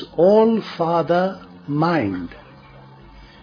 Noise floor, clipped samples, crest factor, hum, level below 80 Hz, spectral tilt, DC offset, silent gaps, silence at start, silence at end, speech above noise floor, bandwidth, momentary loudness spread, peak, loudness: -44 dBFS; under 0.1%; 16 dB; none; -52 dBFS; -8.5 dB/octave; under 0.1%; none; 0 s; 0.15 s; 26 dB; 5.4 kHz; 16 LU; -4 dBFS; -19 LUFS